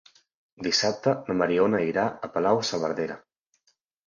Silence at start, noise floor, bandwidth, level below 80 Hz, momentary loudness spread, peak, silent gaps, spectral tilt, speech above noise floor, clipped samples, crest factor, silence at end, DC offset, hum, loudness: 0.6 s; -71 dBFS; 7.6 kHz; -64 dBFS; 9 LU; -8 dBFS; none; -4 dB/octave; 46 dB; under 0.1%; 18 dB; 0.9 s; under 0.1%; none; -25 LUFS